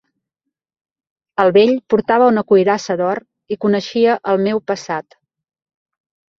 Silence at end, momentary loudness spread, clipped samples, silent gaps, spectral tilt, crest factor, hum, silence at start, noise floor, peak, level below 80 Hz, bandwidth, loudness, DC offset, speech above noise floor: 1.4 s; 13 LU; under 0.1%; none; -6 dB/octave; 16 dB; none; 1.4 s; -80 dBFS; 0 dBFS; -62 dBFS; 7.4 kHz; -16 LUFS; under 0.1%; 65 dB